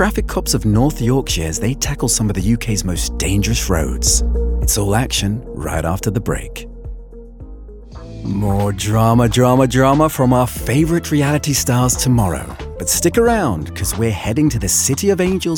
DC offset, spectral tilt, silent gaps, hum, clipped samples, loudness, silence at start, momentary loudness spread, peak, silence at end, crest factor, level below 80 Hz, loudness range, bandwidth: under 0.1%; -4.5 dB/octave; none; none; under 0.1%; -16 LUFS; 0 s; 11 LU; 0 dBFS; 0 s; 16 dB; -26 dBFS; 7 LU; 18 kHz